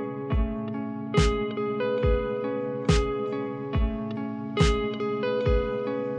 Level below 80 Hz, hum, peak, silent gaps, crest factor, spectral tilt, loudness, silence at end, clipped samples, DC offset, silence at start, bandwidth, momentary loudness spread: -32 dBFS; none; -10 dBFS; none; 18 dB; -6.5 dB/octave; -27 LUFS; 0 s; under 0.1%; under 0.1%; 0 s; 10.5 kHz; 8 LU